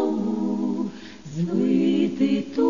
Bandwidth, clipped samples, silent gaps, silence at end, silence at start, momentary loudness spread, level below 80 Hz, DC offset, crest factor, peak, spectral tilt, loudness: 7.4 kHz; under 0.1%; none; 0 s; 0 s; 11 LU; -60 dBFS; 0.4%; 14 dB; -10 dBFS; -7.5 dB/octave; -24 LUFS